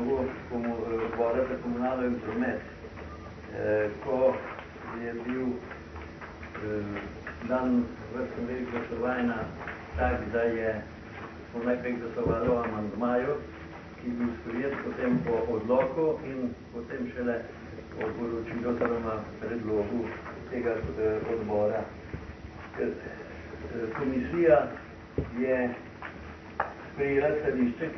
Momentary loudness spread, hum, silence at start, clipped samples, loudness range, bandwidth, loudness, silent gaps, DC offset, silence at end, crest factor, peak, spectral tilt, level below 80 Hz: 15 LU; none; 0 s; under 0.1%; 4 LU; 6.2 kHz; -31 LUFS; none; under 0.1%; 0 s; 22 dB; -10 dBFS; -8.5 dB/octave; -50 dBFS